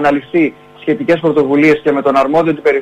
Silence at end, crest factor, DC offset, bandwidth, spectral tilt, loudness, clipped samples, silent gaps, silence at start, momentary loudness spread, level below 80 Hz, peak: 0 s; 12 dB; under 0.1%; 9.2 kHz; -7 dB/octave; -13 LUFS; under 0.1%; none; 0 s; 7 LU; -50 dBFS; -2 dBFS